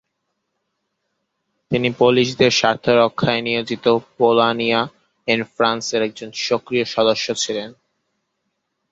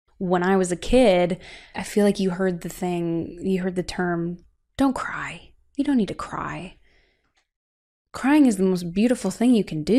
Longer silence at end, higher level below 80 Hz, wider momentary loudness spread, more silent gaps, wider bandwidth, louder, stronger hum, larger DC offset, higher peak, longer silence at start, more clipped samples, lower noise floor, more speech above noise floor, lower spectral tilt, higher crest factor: first, 1.2 s vs 0 s; second, -58 dBFS vs -44 dBFS; second, 9 LU vs 16 LU; second, none vs 7.56-8.05 s; second, 8 kHz vs 14.5 kHz; first, -18 LUFS vs -23 LUFS; neither; neither; first, -2 dBFS vs -6 dBFS; first, 1.7 s vs 0.2 s; neither; first, -75 dBFS vs -68 dBFS; first, 57 dB vs 46 dB; second, -4 dB/octave vs -6 dB/octave; about the same, 18 dB vs 18 dB